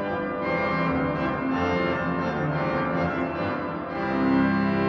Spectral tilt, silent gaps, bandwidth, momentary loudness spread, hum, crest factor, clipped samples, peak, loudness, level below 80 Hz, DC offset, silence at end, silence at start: -8 dB/octave; none; 6.2 kHz; 6 LU; none; 12 dB; under 0.1%; -12 dBFS; -25 LUFS; -48 dBFS; under 0.1%; 0 s; 0 s